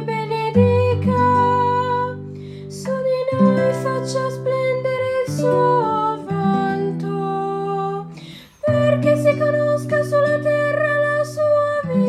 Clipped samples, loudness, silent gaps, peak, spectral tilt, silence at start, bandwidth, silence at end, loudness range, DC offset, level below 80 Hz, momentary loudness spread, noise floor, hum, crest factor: under 0.1%; -19 LUFS; none; -4 dBFS; -7 dB/octave; 0 s; 13.5 kHz; 0 s; 3 LU; under 0.1%; -58 dBFS; 10 LU; -39 dBFS; none; 14 dB